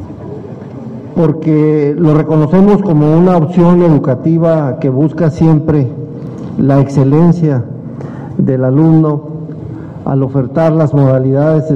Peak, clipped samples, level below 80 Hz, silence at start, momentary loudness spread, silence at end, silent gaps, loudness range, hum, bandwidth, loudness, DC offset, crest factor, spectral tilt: 0 dBFS; under 0.1%; -40 dBFS; 0 s; 16 LU; 0 s; none; 3 LU; none; 7 kHz; -10 LUFS; under 0.1%; 10 dB; -10.5 dB/octave